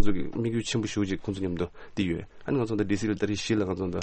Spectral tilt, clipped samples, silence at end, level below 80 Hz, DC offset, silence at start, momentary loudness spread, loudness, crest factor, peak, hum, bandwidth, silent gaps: -6 dB/octave; under 0.1%; 0 s; -44 dBFS; under 0.1%; 0 s; 4 LU; -29 LUFS; 18 dB; -10 dBFS; none; 8.8 kHz; none